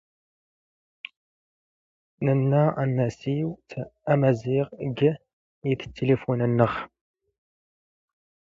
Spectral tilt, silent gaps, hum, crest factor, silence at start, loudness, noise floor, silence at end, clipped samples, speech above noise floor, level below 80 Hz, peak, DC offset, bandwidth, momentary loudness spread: -9 dB/octave; 5.33-5.62 s; none; 20 dB; 2.2 s; -25 LUFS; under -90 dBFS; 1.7 s; under 0.1%; over 66 dB; -60 dBFS; -6 dBFS; under 0.1%; 7.4 kHz; 16 LU